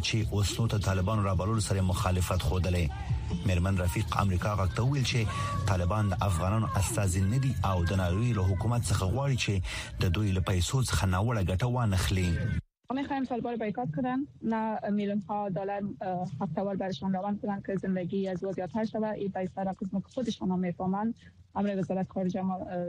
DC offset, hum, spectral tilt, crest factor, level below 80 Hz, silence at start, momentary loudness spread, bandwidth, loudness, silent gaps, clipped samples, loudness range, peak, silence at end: under 0.1%; none; -6 dB/octave; 18 dB; -42 dBFS; 0 s; 6 LU; 15.5 kHz; -30 LUFS; none; under 0.1%; 4 LU; -10 dBFS; 0 s